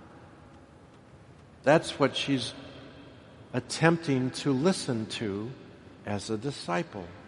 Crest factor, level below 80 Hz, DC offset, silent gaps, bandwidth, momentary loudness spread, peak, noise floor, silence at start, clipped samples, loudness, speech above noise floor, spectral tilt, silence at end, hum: 24 dB; -64 dBFS; under 0.1%; none; 11.5 kHz; 23 LU; -6 dBFS; -53 dBFS; 0 s; under 0.1%; -29 LUFS; 25 dB; -5 dB/octave; 0 s; none